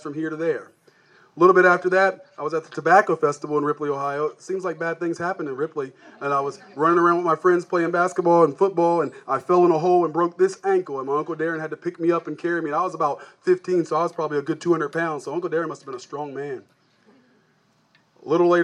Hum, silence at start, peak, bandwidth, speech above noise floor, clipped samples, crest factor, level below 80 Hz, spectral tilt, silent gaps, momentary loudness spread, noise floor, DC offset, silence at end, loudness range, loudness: none; 0.05 s; -2 dBFS; 10 kHz; 41 dB; under 0.1%; 20 dB; -82 dBFS; -6.5 dB/octave; none; 13 LU; -63 dBFS; under 0.1%; 0 s; 7 LU; -22 LUFS